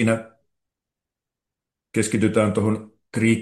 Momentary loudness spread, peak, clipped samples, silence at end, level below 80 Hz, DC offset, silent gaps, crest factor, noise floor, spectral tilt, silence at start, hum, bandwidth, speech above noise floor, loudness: 9 LU; -6 dBFS; under 0.1%; 0 s; -60 dBFS; under 0.1%; none; 18 dB; -87 dBFS; -6 dB/octave; 0 s; none; 12.5 kHz; 67 dB; -22 LUFS